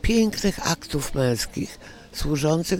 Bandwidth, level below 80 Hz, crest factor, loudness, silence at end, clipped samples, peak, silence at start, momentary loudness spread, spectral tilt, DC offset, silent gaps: 17 kHz; -36 dBFS; 18 dB; -25 LUFS; 0 s; under 0.1%; -6 dBFS; 0.05 s; 12 LU; -5 dB/octave; under 0.1%; none